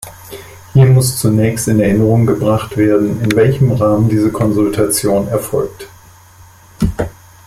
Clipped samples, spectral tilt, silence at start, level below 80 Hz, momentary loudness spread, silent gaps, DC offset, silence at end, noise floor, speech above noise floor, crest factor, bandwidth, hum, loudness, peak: under 0.1%; -6.5 dB/octave; 0 s; -36 dBFS; 11 LU; none; under 0.1%; 0.35 s; -41 dBFS; 29 dB; 12 dB; 15.5 kHz; none; -13 LUFS; 0 dBFS